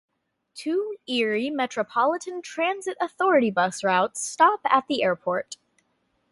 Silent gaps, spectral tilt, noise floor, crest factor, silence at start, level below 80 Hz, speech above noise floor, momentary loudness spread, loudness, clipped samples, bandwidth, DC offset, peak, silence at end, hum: none; -3.5 dB/octave; -71 dBFS; 20 dB; 0.55 s; -74 dBFS; 47 dB; 10 LU; -24 LUFS; under 0.1%; 11.5 kHz; under 0.1%; -4 dBFS; 0.8 s; none